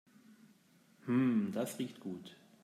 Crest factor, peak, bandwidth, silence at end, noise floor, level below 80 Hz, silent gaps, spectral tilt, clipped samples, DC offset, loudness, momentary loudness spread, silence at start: 16 dB; -22 dBFS; 15 kHz; 0.3 s; -67 dBFS; -86 dBFS; none; -6.5 dB/octave; under 0.1%; under 0.1%; -36 LUFS; 18 LU; 0.3 s